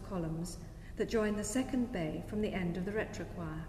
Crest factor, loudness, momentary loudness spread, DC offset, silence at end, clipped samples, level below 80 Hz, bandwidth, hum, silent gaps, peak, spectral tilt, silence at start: 16 dB; -37 LUFS; 9 LU; under 0.1%; 0 s; under 0.1%; -50 dBFS; 15 kHz; none; none; -22 dBFS; -5.5 dB/octave; 0 s